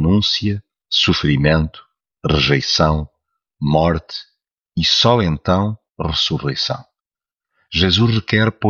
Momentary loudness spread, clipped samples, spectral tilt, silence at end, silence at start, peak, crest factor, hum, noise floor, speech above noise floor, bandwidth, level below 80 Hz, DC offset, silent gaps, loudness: 12 LU; under 0.1%; -5.5 dB/octave; 0 s; 0 s; -2 dBFS; 16 dB; none; -90 dBFS; 73 dB; 7.2 kHz; -34 dBFS; under 0.1%; none; -17 LUFS